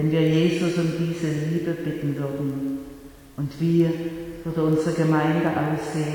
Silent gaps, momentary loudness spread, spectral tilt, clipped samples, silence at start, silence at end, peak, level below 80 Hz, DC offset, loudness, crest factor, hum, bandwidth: none; 12 LU; -7.5 dB/octave; under 0.1%; 0 s; 0 s; -8 dBFS; -52 dBFS; under 0.1%; -24 LUFS; 14 dB; none; 18.5 kHz